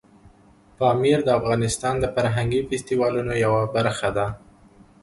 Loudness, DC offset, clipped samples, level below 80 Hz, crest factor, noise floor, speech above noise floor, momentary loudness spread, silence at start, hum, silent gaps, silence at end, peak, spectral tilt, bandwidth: -22 LUFS; under 0.1%; under 0.1%; -46 dBFS; 16 dB; -53 dBFS; 32 dB; 6 LU; 0.25 s; none; none; 0.65 s; -6 dBFS; -5.5 dB/octave; 11.5 kHz